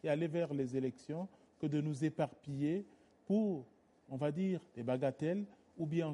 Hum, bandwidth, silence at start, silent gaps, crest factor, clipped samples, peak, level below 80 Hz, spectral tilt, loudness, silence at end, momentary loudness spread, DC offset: none; 11 kHz; 0.05 s; none; 16 dB; under 0.1%; -22 dBFS; -78 dBFS; -8 dB/octave; -38 LUFS; 0 s; 9 LU; under 0.1%